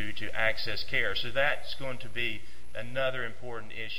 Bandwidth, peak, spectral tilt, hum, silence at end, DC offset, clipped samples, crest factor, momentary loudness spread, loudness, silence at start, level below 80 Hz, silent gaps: 16 kHz; -10 dBFS; -4 dB/octave; none; 0 s; 4%; under 0.1%; 20 dB; 13 LU; -32 LUFS; 0 s; -54 dBFS; none